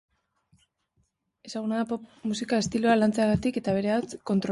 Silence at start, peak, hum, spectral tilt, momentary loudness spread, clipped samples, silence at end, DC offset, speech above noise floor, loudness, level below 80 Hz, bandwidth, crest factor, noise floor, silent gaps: 1.45 s; -10 dBFS; none; -5.5 dB/octave; 10 LU; under 0.1%; 0 s; under 0.1%; 47 dB; -27 LUFS; -56 dBFS; 11.5 kHz; 18 dB; -73 dBFS; none